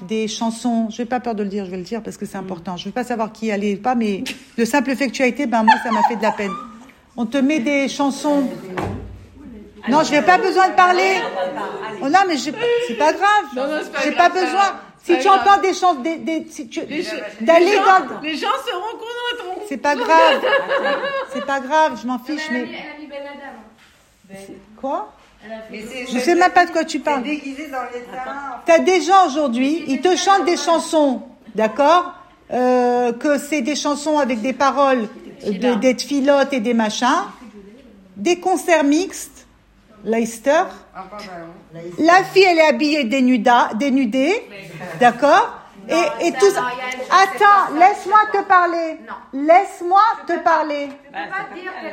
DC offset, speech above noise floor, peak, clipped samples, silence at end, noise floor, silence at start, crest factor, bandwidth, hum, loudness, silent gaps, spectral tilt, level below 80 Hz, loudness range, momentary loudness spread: under 0.1%; 34 dB; 0 dBFS; under 0.1%; 0 s; -52 dBFS; 0 s; 18 dB; 16.5 kHz; none; -17 LUFS; none; -3.5 dB/octave; -56 dBFS; 7 LU; 16 LU